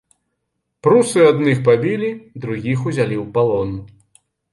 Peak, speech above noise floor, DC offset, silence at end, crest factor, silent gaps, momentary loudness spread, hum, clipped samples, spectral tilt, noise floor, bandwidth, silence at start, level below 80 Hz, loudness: -2 dBFS; 58 dB; under 0.1%; 0.65 s; 16 dB; none; 13 LU; none; under 0.1%; -6.5 dB/octave; -74 dBFS; 11.5 kHz; 0.85 s; -50 dBFS; -17 LUFS